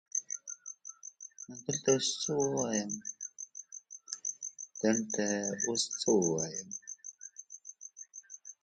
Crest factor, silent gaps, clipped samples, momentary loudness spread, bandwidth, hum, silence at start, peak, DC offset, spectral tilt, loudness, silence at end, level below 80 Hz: 22 dB; none; under 0.1%; 18 LU; 10.5 kHz; none; 0.15 s; -14 dBFS; under 0.1%; -3 dB/octave; -33 LUFS; 0.1 s; -76 dBFS